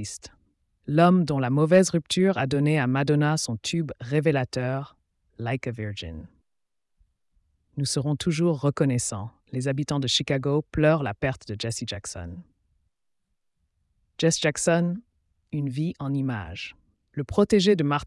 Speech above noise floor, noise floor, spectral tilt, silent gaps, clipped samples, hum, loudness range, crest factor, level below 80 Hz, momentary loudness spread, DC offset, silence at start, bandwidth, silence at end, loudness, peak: 54 dB; -78 dBFS; -5.5 dB/octave; none; under 0.1%; none; 9 LU; 18 dB; -54 dBFS; 17 LU; under 0.1%; 0 s; 12 kHz; 0 s; -25 LUFS; -8 dBFS